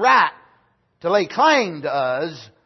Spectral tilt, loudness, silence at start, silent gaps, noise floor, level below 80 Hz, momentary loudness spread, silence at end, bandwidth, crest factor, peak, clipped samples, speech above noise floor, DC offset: -4 dB/octave; -19 LUFS; 0 s; none; -61 dBFS; -72 dBFS; 11 LU; 0.2 s; 6.2 kHz; 16 dB; -2 dBFS; under 0.1%; 42 dB; under 0.1%